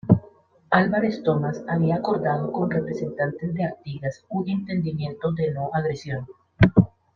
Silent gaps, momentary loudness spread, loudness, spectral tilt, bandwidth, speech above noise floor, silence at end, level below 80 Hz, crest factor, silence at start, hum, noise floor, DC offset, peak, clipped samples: none; 11 LU; -24 LUFS; -8.5 dB/octave; 7 kHz; 28 dB; 0.3 s; -48 dBFS; 22 dB; 0.05 s; none; -52 dBFS; under 0.1%; -2 dBFS; under 0.1%